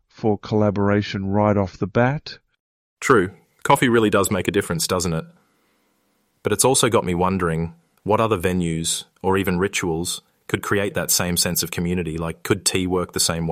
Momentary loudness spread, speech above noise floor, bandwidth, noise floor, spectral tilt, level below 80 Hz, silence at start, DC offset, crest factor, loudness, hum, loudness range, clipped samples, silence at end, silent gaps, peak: 10 LU; 46 dB; 16 kHz; -66 dBFS; -4 dB/octave; -50 dBFS; 0.2 s; under 0.1%; 18 dB; -21 LUFS; none; 2 LU; under 0.1%; 0 s; 2.60-2.97 s; -2 dBFS